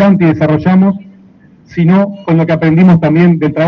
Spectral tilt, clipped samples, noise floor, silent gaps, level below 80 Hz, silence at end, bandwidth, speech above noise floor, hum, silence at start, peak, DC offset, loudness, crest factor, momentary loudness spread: -10 dB/octave; under 0.1%; -41 dBFS; none; -44 dBFS; 0 s; 5.8 kHz; 33 dB; none; 0 s; 0 dBFS; under 0.1%; -9 LUFS; 8 dB; 6 LU